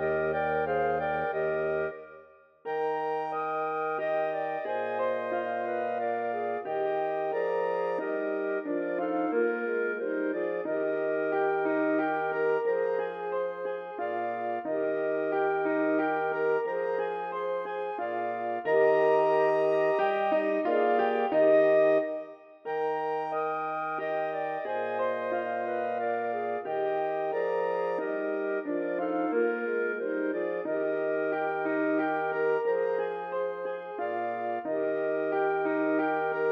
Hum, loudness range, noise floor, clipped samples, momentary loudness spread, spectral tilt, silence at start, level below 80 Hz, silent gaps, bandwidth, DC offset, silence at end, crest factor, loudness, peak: none; 5 LU; -55 dBFS; under 0.1%; 7 LU; -7.5 dB/octave; 0 s; -70 dBFS; none; 6 kHz; under 0.1%; 0 s; 16 dB; -29 LUFS; -12 dBFS